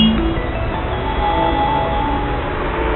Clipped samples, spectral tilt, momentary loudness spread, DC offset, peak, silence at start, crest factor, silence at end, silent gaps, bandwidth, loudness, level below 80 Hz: under 0.1%; -11.5 dB/octave; 5 LU; under 0.1%; -2 dBFS; 0 s; 16 dB; 0 s; none; 4.3 kHz; -19 LUFS; -24 dBFS